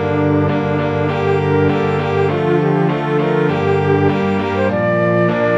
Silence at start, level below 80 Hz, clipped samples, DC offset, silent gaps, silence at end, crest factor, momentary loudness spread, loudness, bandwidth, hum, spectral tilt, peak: 0 s; -50 dBFS; under 0.1%; under 0.1%; none; 0 s; 14 dB; 2 LU; -16 LUFS; 7.4 kHz; none; -8.5 dB/octave; -2 dBFS